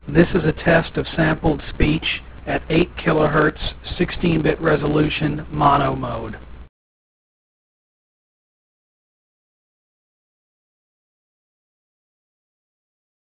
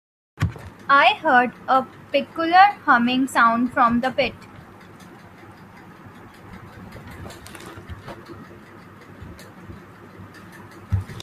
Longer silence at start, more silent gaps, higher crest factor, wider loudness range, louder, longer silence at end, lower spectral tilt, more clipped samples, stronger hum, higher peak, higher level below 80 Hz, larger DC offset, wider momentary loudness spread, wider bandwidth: second, 0.05 s vs 0.4 s; neither; about the same, 22 dB vs 22 dB; second, 6 LU vs 23 LU; about the same, -19 LUFS vs -19 LUFS; first, 6.7 s vs 0 s; first, -10.5 dB/octave vs -5.5 dB/octave; neither; neither; about the same, 0 dBFS vs 0 dBFS; first, -36 dBFS vs -50 dBFS; neither; second, 10 LU vs 27 LU; second, 4 kHz vs 14.5 kHz